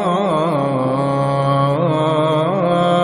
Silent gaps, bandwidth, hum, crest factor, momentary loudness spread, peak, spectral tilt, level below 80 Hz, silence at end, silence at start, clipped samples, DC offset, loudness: none; 11 kHz; none; 12 dB; 2 LU; -4 dBFS; -7.5 dB/octave; -52 dBFS; 0 s; 0 s; under 0.1%; under 0.1%; -16 LUFS